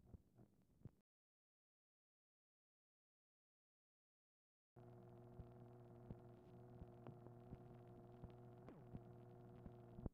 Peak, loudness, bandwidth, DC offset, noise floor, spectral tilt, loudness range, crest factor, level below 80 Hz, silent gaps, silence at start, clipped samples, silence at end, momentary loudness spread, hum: -32 dBFS; -63 LUFS; 4.5 kHz; under 0.1%; under -90 dBFS; -9.5 dB/octave; 5 LU; 32 dB; -72 dBFS; 1.01-4.76 s; 0 s; under 0.1%; 0 s; 7 LU; none